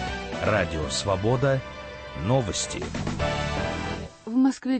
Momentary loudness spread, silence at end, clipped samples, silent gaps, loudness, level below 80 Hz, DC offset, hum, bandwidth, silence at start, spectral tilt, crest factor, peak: 10 LU; 0 s; under 0.1%; none; -26 LUFS; -40 dBFS; under 0.1%; none; 8.8 kHz; 0 s; -5 dB/octave; 16 dB; -10 dBFS